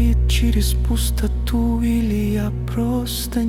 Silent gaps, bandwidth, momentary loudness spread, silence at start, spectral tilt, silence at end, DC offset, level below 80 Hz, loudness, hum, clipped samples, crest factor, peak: none; 16.5 kHz; 5 LU; 0 s; -6 dB/octave; 0 s; under 0.1%; -20 dBFS; -20 LUFS; none; under 0.1%; 12 dB; -6 dBFS